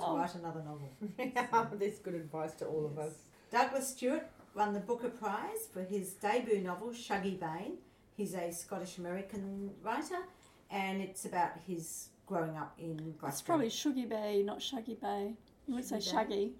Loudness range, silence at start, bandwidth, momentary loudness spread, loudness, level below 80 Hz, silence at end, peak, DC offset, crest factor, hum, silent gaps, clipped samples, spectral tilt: 4 LU; 0 s; 17 kHz; 10 LU; -38 LUFS; -72 dBFS; 0 s; -16 dBFS; under 0.1%; 22 dB; none; none; under 0.1%; -4.5 dB/octave